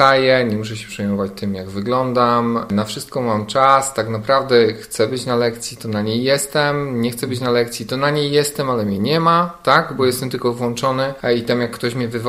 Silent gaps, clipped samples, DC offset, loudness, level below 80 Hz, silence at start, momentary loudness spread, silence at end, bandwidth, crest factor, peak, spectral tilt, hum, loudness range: none; under 0.1%; under 0.1%; -18 LUFS; -50 dBFS; 0 s; 8 LU; 0 s; 16 kHz; 18 dB; 0 dBFS; -5 dB/octave; none; 2 LU